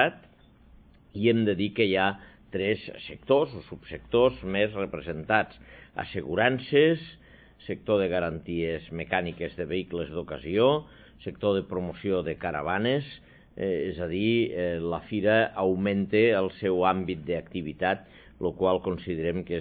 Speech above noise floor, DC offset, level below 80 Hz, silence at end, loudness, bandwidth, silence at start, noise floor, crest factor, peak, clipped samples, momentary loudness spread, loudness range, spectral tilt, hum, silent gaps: 29 dB; under 0.1%; -54 dBFS; 0 s; -27 LUFS; 4.8 kHz; 0 s; -56 dBFS; 20 dB; -6 dBFS; under 0.1%; 13 LU; 4 LU; -10 dB/octave; none; none